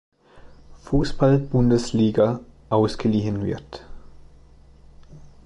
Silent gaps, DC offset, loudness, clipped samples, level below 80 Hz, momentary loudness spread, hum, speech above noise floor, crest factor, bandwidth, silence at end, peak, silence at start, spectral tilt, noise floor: none; under 0.1%; -22 LUFS; under 0.1%; -40 dBFS; 13 LU; none; 29 dB; 18 dB; 11 kHz; 0.25 s; -6 dBFS; 0.35 s; -7.5 dB/octave; -49 dBFS